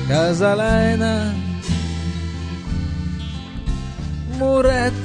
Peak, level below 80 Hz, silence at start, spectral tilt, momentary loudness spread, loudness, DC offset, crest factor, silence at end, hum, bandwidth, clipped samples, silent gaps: -4 dBFS; -30 dBFS; 0 s; -6.5 dB/octave; 12 LU; -21 LUFS; under 0.1%; 16 dB; 0 s; none; 10.5 kHz; under 0.1%; none